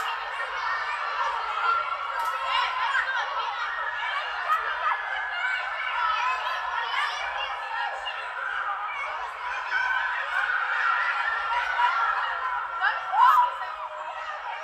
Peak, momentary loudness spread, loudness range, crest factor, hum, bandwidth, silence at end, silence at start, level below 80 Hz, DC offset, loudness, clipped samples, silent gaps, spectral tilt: -8 dBFS; 8 LU; 5 LU; 18 dB; none; 14.5 kHz; 0 s; 0 s; -64 dBFS; under 0.1%; -26 LUFS; under 0.1%; none; 0.5 dB/octave